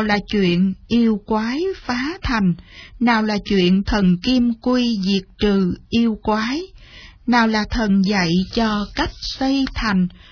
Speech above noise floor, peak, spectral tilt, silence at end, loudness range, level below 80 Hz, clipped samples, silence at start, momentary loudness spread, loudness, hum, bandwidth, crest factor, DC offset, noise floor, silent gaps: 24 dB; -2 dBFS; -6 dB/octave; 0.2 s; 2 LU; -36 dBFS; under 0.1%; 0 s; 6 LU; -19 LUFS; none; 5.4 kHz; 16 dB; under 0.1%; -42 dBFS; none